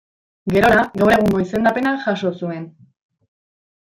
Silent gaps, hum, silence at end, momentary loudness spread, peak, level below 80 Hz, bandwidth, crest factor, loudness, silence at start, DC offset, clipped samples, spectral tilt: none; none; 1.15 s; 15 LU; -2 dBFS; -46 dBFS; 16.5 kHz; 16 dB; -17 LUFS; 0.45 s; under 0.1%; under 0.1%; -6.5 dB/octave